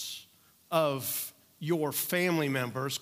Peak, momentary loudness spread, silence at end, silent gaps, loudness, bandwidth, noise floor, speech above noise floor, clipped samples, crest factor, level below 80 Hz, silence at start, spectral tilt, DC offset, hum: -12 dBFS; 12 LU; 0 s; none; -31 LUFS; 16 kHz; -61 dBFS; 31 dB; under 0.1%; 20 dB; -80 dBFS; 0 s; -4 dB/octave; under 0.1%; none